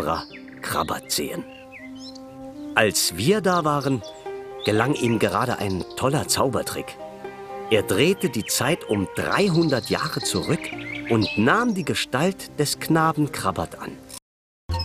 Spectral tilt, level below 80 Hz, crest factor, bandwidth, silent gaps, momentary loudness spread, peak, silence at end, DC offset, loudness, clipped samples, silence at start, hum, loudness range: -4.5 dB/octave; -50 dBFS; 22 dB; 16 kHz; 14.22-14.69 s; 17 LU; 0 dBFS; 0 s; under 0.1%; -23 LUFS; under 0.1%; 0 s; none; 2 LU